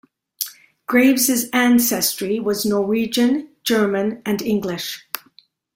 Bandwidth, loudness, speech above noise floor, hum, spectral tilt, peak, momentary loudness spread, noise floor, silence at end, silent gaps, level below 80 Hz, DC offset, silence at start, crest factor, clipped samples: 16.5 kHz; -19 LUFS; 36 dB; none; -3.5 dB/octave; 0 dBFS; 13 LU; -55 dBFS; 0.6 s; none; -62 dBFS; under 0.1%; 0.4 s; 20 dB; under 0.1%